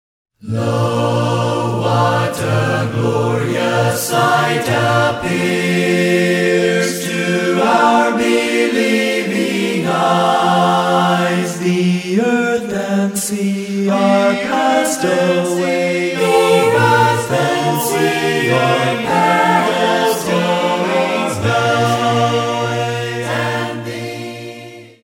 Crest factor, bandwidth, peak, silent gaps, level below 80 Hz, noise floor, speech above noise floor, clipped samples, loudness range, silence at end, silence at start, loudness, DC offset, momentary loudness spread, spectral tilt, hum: 14 dB; 16.5 kHz; 0 dBFS; none; -56 dBFS; -35 dBFS; 20 dB; under 0.1%; 2 LU; 0.15 s; 0.45 s; -15 LUFS; under 0.1%; 6 LU; -5 dB/octave; none